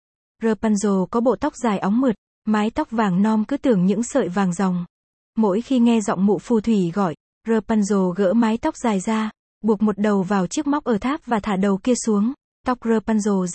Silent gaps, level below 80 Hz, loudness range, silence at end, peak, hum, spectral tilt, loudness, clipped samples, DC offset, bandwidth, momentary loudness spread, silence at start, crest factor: 2.18-2.42 s, 4.90-5.33 s, 7.20-7.41 s, 9.39-9.61 s, 12.44-12.64 s; -52 dBFS; 1 LU; 0 s; -6 dBFS; none; -6.5 dB/octave; -21 LUFS; under 0.1%; under 0.1%; 8.8 kHz; 6 LU; 0.4 s; 14 dB